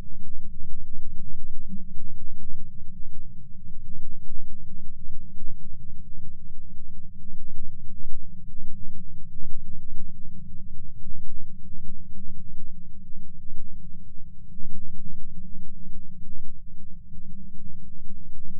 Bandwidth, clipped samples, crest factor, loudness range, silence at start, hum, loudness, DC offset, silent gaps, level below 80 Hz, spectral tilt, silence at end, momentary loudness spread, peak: 0.2 kHz; under 0.1%; 10 dB; 2 LU; 0 s; none; -46 LUFS; under 0.1%; none; -32 dBFS; -13.5 dB/octave; 0 s; 4 LU; -6 dBFS